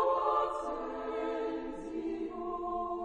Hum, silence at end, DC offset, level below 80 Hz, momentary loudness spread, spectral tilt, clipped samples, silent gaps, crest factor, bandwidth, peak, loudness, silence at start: none; 0 s; under 0.1%; -58 dBFS; 8 LU; -5.5 dB/octave; under 0.1%; none; 18 dB; 9.6 kHz; -18 dBFS; -35 LUFS; 0 s